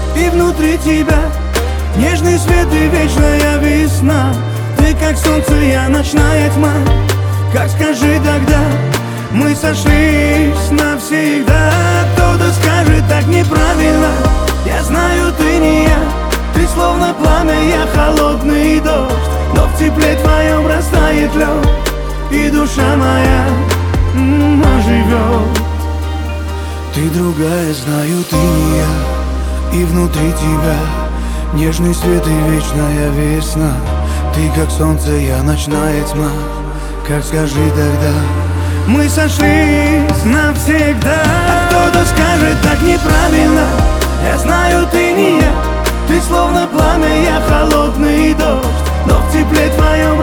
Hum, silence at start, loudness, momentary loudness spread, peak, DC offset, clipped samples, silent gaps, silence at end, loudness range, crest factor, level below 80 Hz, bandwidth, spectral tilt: none; 0 s; -12 LUFS; 6 LU; 0 dBFS; under 0.1%; under 0.1%; none; 0 s; 4 LU; 10 dB; -16 dBFS; over 20 kHz; -6 dB/octave